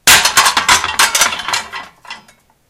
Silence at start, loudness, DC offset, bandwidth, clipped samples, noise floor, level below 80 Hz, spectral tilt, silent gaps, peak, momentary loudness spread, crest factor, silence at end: 0.05 s; -10 LUFS; under 0.1%; over 20 kHz; 0.3%; -49 dBFS; -44 dBFS; 1 dB/octave; none; 0 dBFS; 21 LU; 14 dB; 0.5 s